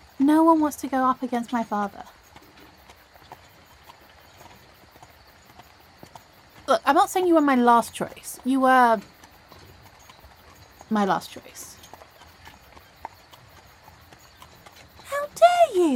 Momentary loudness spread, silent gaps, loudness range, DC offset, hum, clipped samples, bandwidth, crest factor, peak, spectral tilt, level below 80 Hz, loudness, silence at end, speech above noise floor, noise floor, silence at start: 24 LU; none; 16 LU; under 0.1%; none; under 0.1%; 17 kHz; 20 dB; -4 dBFS; -4.5 dB/octave; -60 dBFS; -21 LUFS; 0 s; 31 dB; -52 dBFS; 0.2 s